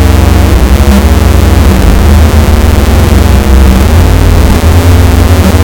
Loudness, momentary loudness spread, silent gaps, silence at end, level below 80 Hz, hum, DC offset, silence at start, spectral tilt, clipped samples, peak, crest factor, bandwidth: -5 LUFS; 1 LU; none; 0 s; -6 dBFS; none; under 0.1%; 0 s; -6 dB/octave; 30%; 0 dBFS; 4 dB; 18 kHz